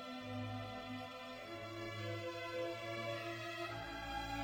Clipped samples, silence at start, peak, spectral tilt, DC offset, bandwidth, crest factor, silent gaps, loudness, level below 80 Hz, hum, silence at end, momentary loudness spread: under 0.1%; 0 s; -32 dBFS; -5 dB/octave; under 0.1%; 16.5 kHz; 14 dB; none; -45 LUFS; -62 dBFS; none; 0 s; 5 LU